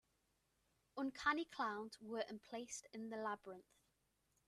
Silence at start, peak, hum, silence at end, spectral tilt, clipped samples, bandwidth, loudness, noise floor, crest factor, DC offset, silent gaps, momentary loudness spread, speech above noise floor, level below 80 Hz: 0.95 s; -24 dBFS; none; 0.85 s; -3 dB/octave; under 0.1%; 13.5 kHz; -46 LUFS; -83 dBFS; 24 dB; under 0.1%; none; 11 LU; 37 dB; -80 dBFS